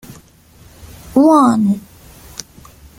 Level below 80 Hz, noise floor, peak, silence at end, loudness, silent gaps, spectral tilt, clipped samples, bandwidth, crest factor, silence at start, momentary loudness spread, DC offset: -46 dBFS; -45 dBFS; -2 dBFS; 1.2 s; -13 LUFS; none; -6.5 dB/octave; under 0.1%; 16.5 kHz; 16 dB; 0.1 s; 22 LU; under 0.1%